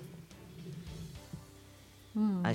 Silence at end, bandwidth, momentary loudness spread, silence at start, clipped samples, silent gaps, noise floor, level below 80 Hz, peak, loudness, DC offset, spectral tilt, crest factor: 0 s; 16.5 kHz; 22 LU; 0 s; under 0.1%; none; -56 dBFS; -60 dBFS; -16 dBFS; -40 LUFS; under 0.1%; -7 dB/octave; 22 dB